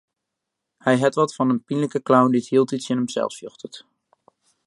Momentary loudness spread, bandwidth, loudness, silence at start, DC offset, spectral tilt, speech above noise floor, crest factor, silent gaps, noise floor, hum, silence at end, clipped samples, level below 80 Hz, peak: 18 LU; 11.5 kHz; -21 LUFS; 0.85 s; under 0.1%; -6 dB/octave; 61 dB; 20 dB; none; -82 dBFS; none; 0.9 s; under 0.1%; -72 dBFS; -2 dBFS